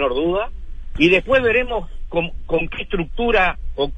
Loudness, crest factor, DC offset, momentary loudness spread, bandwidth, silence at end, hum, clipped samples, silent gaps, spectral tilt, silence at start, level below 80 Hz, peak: -19 LUFS; 18 dB; under 0.1%; 11 LU; 8.4 kHz; 0 s; none; under 0.1%; none; -6.5 dB/octave; 0 s; -30 dBFS; -2 dBFS